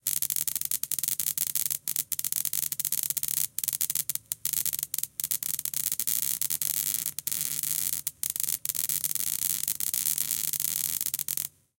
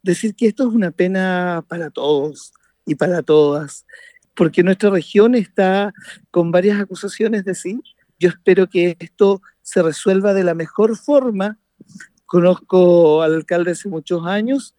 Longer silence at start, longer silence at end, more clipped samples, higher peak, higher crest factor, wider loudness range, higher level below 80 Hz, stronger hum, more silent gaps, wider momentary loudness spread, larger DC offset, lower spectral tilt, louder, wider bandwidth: about the same, 0.05 s vs 0.05 s; first, 0.3 s vs 0.1 s; neither; about the same, -4 dBFS vs -2 dBFS; first, 26 dB vs 16 dB; about the same, 1 LU vs 3 LU; about the same, -68 dBFS vs -66 dBFS; neither; neither; second, 3 LU vs 11 LU; neither; second, 1 dB/octave vs -6.5 dB/octave; second, -27 LUFS vs -17 LUFS; first, 17.5 kHz vs 11.5 kHz